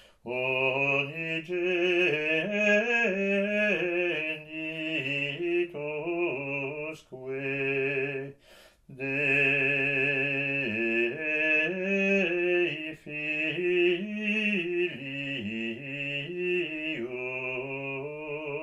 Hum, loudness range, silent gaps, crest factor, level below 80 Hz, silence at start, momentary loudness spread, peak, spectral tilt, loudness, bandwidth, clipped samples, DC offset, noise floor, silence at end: none; 6 LU; none; 16 dB; -68 dBFS; 0.25 s; 10 LU; -12 dBFS; -6 dB/octave; -28 LUFS; 8.4 kHz; under 0.1%; under 0.1%; -57 dBFS; 0 s